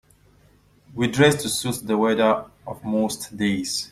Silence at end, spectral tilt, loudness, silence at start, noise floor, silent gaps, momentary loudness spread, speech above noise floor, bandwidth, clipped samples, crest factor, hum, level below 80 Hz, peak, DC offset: 0.05 s; -4.5 dB/octave; -22 LUFS; 0.9 s; -56 dBFS; none; 9 LU; 34 dB; 15.5 kHz; under 0.1%; 22 dB; 50 Hz at -50 dBFS; -56 dBFS; -2 dBFS; under 0.1%